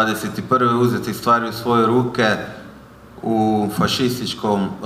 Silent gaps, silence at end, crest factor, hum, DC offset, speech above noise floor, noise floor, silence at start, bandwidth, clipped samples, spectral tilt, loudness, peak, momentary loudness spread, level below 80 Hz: none; 0 s; 16 dB; none; under 0.1%; 23 dB; -41 dBFS; 0 s; 15.5 kHz; under 0.1%; -5.5 dB/octave; -18 LUFS; -4 dBFS; 8 LU; -50 dBFS